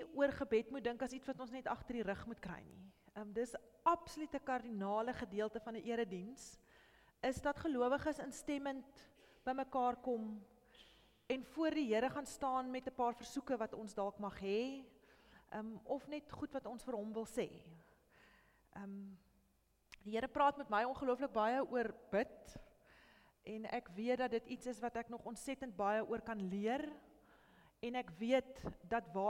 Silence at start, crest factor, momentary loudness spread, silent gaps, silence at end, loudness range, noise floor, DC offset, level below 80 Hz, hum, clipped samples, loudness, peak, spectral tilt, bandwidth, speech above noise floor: 0 s; 22 dB; 14 LU; none; 0 s; 7 LU; -77 dBFS; under 0.1%; -68 dBFS; none; under 0.1%; -42 LUFS; -20 dBFS; -5 dB/octave; 16.5 kHz; 36 dB